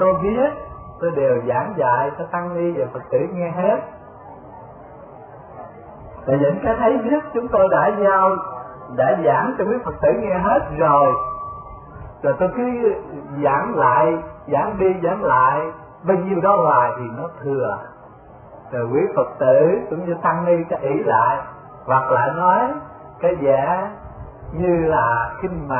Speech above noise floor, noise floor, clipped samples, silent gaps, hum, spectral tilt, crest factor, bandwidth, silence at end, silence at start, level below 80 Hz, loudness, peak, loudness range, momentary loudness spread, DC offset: 24 dB; -42 dBFS; under 0.1%; none; none; -12.5 dB/octave; 16 dB; 3.3 kHz; 0 s; 0 s; -46 dBFS; -19 LUFS; -4 dBFS; 5 LU; 20 LU; under 0.1%